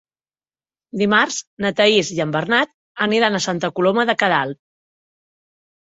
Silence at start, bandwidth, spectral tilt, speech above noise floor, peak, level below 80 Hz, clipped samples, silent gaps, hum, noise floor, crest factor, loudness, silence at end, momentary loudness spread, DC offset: 0.95 s; 8 kHz; -4 dB/octave; over 72 dB; 0 dBFS; -62 dBFS; under 0.1%; 1.47-1.57 s, 2.74-2.95 s; none; under -90 dBFS; 20 dB; -18 LUFS; 1.4 s; 8 LU; under 0.1%